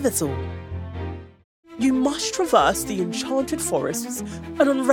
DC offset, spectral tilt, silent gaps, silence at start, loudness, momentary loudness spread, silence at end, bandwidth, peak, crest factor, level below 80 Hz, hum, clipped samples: under 0.1%; -4 dB/octave; 1.44-1.63 s; 0 s; -23 LUFS; 15 LU; 0 s; 17.5 kHz; -4 dBFS; 20 dB; -48 dBFS; none; under 0.1%